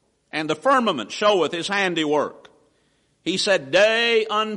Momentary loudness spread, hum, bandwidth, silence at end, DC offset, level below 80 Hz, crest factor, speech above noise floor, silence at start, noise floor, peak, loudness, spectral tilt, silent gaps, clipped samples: 11 LU; none; 11.5 kHz; 0 s; under 0.1%; -66 dBFS; 14 dB; 44 dB; 0.35 s; -65 dBFS; -6 dBFS; -20 LUFS; -3.5 dB/octave; none; under 0.1%